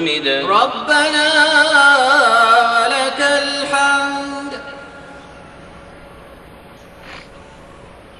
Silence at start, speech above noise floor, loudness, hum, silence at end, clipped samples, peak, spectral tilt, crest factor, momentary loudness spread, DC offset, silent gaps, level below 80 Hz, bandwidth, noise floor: 0 s; 26 dB; -13 LUFS; none; 0.75 s; under 0.1%; 0 dBFS; -1.5 dB/octave; 16 dB; 21 LU; under 0.1%; none; -52 dBFS; 12 kHz; -39 dBFS